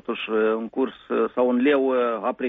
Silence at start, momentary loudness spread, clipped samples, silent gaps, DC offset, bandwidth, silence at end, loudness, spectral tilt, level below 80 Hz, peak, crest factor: 0.1 s; 6 LU; under 0.1%; none; under 0.1%; 4 kHz; 0 s; -23 LUFS; -3 dB/octave; -66 dBFS; -10 dBFS; 14 dB